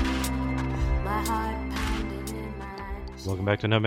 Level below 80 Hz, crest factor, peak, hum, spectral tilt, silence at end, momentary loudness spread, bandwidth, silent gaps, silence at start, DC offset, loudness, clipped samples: -34 dBFS; 18 dB; -8 dBFS; none; -5.5 dB/octave; 0 s; 10 LU; 18 kHz; none; 0 s; under 0.1%; -30 LUFS; under 0.1%